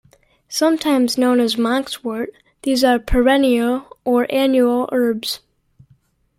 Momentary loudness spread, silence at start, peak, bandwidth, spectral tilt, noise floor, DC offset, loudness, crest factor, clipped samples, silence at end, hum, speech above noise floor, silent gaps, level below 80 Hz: 11 LU; 0.5 s; -2 dBFS; 16 kHz; -4 dB/octave; -57 dBFS; under 0.1%; -18 LUFS; 16 dB; under 0.1%; 1 s; none; 41 dB; none; -36 dBFS